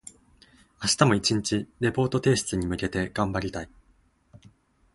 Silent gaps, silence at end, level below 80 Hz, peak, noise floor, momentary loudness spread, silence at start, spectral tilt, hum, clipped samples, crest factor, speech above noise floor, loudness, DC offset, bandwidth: none; 1.3 s; -48 dBFS; -2 dBFS; -63 dBFS; 13 LU; 0.05 s; -4.5 dB/octave; none; under 0.1%; 26 dB; 38 dB; -25 LUFS; under 0.1%; 11.5 kHz